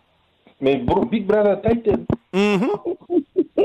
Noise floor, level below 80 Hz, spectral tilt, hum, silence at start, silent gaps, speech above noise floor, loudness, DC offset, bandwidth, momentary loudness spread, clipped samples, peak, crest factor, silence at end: -57 dBFS; -44 dBFS; -7.5 dB/octave; none; 0.6 s; none; 38 dB; -20 LUFS; under 0.1%; 8.8 kHz; 6 LU; under 0.1%; -8 dBFS; 12 dB; 0 s